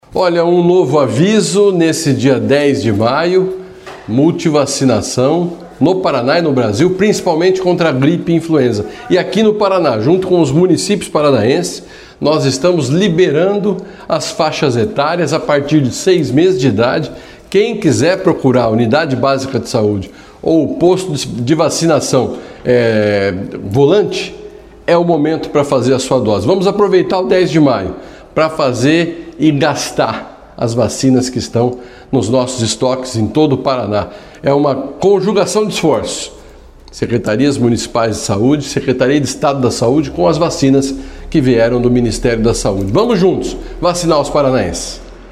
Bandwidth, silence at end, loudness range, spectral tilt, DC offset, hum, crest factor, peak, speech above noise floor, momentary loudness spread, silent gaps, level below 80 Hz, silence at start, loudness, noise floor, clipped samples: 14.5 kHz; 0 s; 2 LU; -5.5 dB/octave; under 0.1%; none; 12 dB; 0 dBFS; 25 dB; 8 LU; none; -38 dBFS; 0.1 s; -13 LUFS; -37 dBFS; under 0.1%